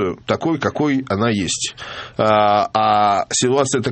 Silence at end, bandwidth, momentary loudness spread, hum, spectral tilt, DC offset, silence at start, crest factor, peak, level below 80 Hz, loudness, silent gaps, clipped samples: 0 s; 8.8 kHz; 7 LU; none; -4 dB/octave; under 0.1%; 0 s; 16 dB; 0 dBFS; -54 dBFS; -17 LUFS; none; under 0.1%